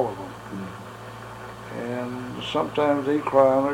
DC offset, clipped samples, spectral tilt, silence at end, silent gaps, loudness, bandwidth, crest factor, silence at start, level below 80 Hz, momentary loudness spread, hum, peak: under 0.1%; under 0.1%; -6.5 dB/octave; 0 s; none; -25 LUFS; 16 kHz; 20 dB; 0 s; -56 dBFS; 20 LU; none; -4 dBFS